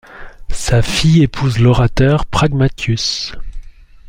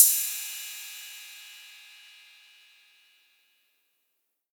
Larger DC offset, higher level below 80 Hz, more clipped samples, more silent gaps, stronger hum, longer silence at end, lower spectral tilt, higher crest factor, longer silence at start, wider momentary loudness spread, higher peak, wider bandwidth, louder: neither; first, -26 dBFS vs under -90 dBFS; neither; neither; neither; second, 0 s vs 2.85 s; first, -5.5 dB/octave vs 9.5 dB/octave; second, 12 dB vs 30 dB; about the same, 0.1 s vs 0 s; second, 12 LU vs 23 LU; about the same, -2 dBFS vs -2 dBFS; second, 16 kHz vs over 20 kHz; first, -14 LUFS vs -28 LUFS